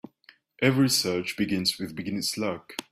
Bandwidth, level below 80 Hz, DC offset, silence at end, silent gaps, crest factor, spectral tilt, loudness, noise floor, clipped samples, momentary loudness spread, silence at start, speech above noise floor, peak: 15.5 kHz; -62 dBFS; under 0.1%; 0.1 s; none; 20 dB; -4 dB/octave; -26 LUFS; -59 dBFS; under 0.1%; 10 LU; 0.6 s; 32 dB; -8 dBFS